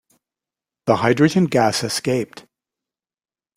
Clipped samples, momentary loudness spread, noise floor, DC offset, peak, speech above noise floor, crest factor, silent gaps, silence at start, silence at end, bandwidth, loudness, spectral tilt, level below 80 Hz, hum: under 0.1%; 9 LU; under -90 dBFS; under 0.1%; -2 dBFS; over 72 dB; 20 dB; none; 0.85 s; 1.15 s; 16 kHz; -18 LUFS; -5 dB/octave; -58 dBFS; none